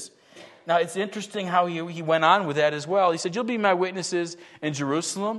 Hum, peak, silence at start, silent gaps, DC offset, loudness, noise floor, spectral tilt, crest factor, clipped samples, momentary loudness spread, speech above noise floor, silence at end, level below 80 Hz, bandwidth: none; -4 dBFS; 0 s; none; under 0.1%; -24 LUFS; -49 dBFS; -4 dB/octave; 20 dB; under 0.1%; 11 LU; 25 dB; 0 s; -76 dBFS; 12.5 kHz